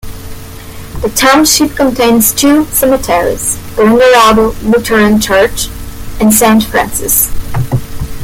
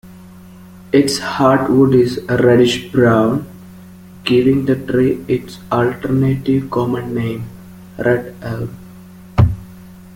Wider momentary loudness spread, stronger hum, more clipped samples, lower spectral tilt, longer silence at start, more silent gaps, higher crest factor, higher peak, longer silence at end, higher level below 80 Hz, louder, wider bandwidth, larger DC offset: first, 21 LU vs 14 LU; neither; first, 0.1% vs under 0.1%; second, -3.5 dB/octave vs -6.5 dB/octave; about the same, 0.05 s vs 0.05 s; neither; second, 10 dB vs 16 dB; about the same, 0 dBFS vs 0 dBFS; about the same, 0 s vs 0 s; first, -26 dBFS vs -40 dBFS; first, -9 LUFS vs -16 LUFS; first, 19 kHz vs 16.5 kHz; neither